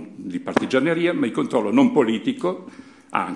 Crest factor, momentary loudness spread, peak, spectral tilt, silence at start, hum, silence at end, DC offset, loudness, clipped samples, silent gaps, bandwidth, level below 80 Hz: 20 dB; 11 LU; -2 dBFS; -6 dB/octave; 0 s; none; 0 s; under 0.1%; -21 LUFS; under 0.1%; none; 11 kHz; -68 dBFS